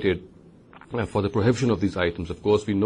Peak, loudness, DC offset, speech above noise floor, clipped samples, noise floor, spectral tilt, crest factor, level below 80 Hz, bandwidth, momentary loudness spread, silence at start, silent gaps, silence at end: -8 dBFS; -25 LUFS; under 0.1%; 26 dB; under 0.1%; -49 dBFS; -7 dB/octave; 16 dB; -48 dBFS; 10.5 kHz; 9 LU; 0 s; none; 0 s